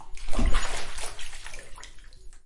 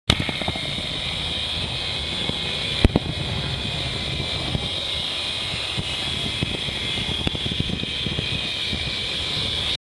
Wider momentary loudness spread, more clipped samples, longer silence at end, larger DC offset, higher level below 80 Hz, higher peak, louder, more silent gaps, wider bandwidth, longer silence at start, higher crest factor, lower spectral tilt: first, 19 LU vs 4 LU; neither; second, 0.1 s vs 0.25 s; neither; first, -30 dBFS vs -36 dBFS; second, -8 dBFS vs 0 dBFS; second, -34 LUFS vs -24 LUFS; neither; about the same, 11.5 kHz vs 12 kHz; about the same, 0 s vs 0.05 s; second, 14 dB vs 26 dB; about the same, -3.5 dB/octave vs -4 dB/octave